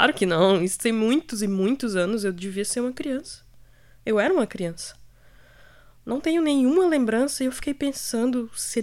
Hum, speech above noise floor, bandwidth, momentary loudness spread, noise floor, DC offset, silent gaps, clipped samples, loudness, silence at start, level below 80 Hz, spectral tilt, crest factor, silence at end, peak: none; 28 dB; 16 kHz; 12 LU; -51 dBFS; under 0.1%; none; under 0.1%; -24 LUFS; 0 s; -54 dBFS; -4.5 dB/octave; 20 dB; 0 s; -4 dBFS